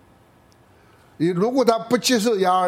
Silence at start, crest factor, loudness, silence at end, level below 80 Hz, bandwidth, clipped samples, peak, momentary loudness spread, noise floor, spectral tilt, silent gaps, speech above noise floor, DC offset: 1.2 s; 18 dB; -20 LUFS; 0 s; -62 dBFS; 16.5 kHz; under 0.1%; -4 dBFS; 5 LU; -54 dBFS; -4.5 dB/octave; none; 35 dB; under 0.1%